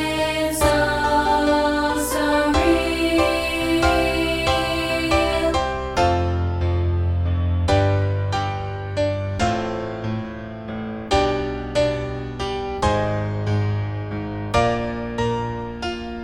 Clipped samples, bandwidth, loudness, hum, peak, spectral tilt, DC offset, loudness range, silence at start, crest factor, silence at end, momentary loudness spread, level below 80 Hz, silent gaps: under 0.1%; 16.5 kHz; -21 LUFS; none; -4 dBFS; -5.5 dB/octave; under 0.1%; 5 LU; 0 s; 16 dB; 0 s; 10 LU; -34 dBFS; none